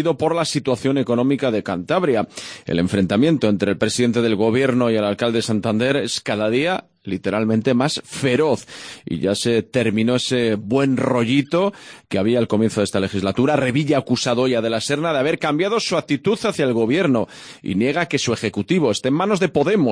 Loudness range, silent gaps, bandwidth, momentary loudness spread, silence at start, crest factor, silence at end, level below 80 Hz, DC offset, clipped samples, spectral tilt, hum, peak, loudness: 2 LU; none; 10.5 kHz; 5 LU; 0 s; 16 dB; 0 s; -56 dBFS; under 0.1%; under 0.1%; -5.5 dB/octave; none; -4 dBFS; -19 LUFS